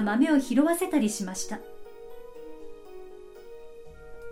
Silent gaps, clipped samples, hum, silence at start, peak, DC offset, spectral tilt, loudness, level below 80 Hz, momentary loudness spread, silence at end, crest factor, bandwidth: none; under 0.1%; none; 0 s; -10 dBFS; under 0.1%; -4.5 dB/octave; -26 LUFS; -56 dBFS; 24 LU; 0 s; 20 dB; 16.5 kHz